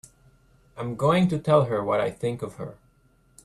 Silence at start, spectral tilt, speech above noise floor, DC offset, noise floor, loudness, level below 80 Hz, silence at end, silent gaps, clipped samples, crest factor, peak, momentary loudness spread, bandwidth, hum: 0.75 s; -7.5 dB/octave; 38 dB; under 0.1%; -61 dBFS; -24 LUFS; -58 dBFS; 0.7 s; none; under 0.1%; 20 dB; -6 dBFS; 15 LU; 12.5 kHz; none